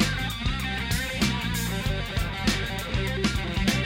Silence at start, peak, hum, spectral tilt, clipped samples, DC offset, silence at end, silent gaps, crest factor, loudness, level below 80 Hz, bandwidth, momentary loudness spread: 0 s; -10 dBFS; none; -4.5 dB/octave; under 0.1%; under 0.1%; 0 s; none; 18 dB; -27 LUFS; -34 dBFS; 16.5 kHz; 3 LU